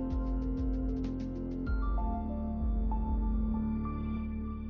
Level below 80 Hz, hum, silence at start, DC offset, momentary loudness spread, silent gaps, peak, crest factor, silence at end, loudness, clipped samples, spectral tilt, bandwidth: -34 dBFS; none; 0 s; under 0.1%; 4 LU; none; -24 dBFS; 8 dB; 0 s; -35 LUFS; under 0.1%; -10 dB/octave; 4.5 kHz